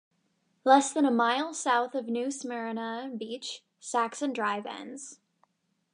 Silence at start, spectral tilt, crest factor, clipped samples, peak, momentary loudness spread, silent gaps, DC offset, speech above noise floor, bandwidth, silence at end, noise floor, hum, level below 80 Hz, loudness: 0.65 s; -2.5 dB/octave; 22 dB; under 0.1%; -8 dBFS; 17 LU; none; under 0.1%; 45 dB; 11 kHz; 0.8 s; -73 dBFS; none; -88 dBFS; -29 LUFS